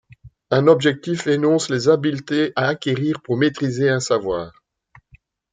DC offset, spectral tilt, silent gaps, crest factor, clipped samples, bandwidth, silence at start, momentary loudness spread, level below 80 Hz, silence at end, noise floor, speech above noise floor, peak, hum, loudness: under 0.1%; -5.5 dB/octave; none; 18 dB; under 0.1%; 9.4 kHz; 0.25 s; 7 LU; -56 dBFS; 1.05 s; -54 dBFS; 36 dB; -2 dBFS; none; -19 LUFS